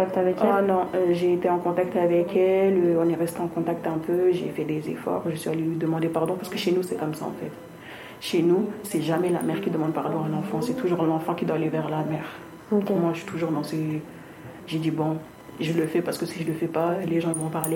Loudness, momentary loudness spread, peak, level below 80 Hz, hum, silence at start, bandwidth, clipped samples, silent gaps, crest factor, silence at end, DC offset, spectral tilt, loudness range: -25 LUFS; 11 LU; -6 dBFS; -64 dBFS; none; 0 s; 17 kHz; under 0.1%; none; 18 dB; 0 s; under 0.1%; -6.5 dB/octave; 5 LU